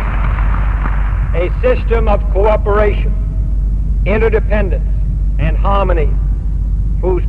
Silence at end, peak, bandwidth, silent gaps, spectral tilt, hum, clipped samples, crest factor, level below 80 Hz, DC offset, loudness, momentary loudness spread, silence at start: 0 s; 0 dBFS; 3.8 kHz; none; -9 dB/octave; none; under 0.1%; 12 dB; -14 dBFS; 2%; -15 LUFS; 5 LU; 0 s